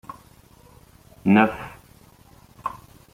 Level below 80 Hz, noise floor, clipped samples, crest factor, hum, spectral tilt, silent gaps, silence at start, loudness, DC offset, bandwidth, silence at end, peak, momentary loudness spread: -56 dBFS; -52 dBFS; under 0.1%; 24 dB; none; -7.5 dB/octave; none; 1.25 s; -22 LUFS; under 0.1%; 15.5 kHz; 0.35 s; -2 dBFS; 26 LU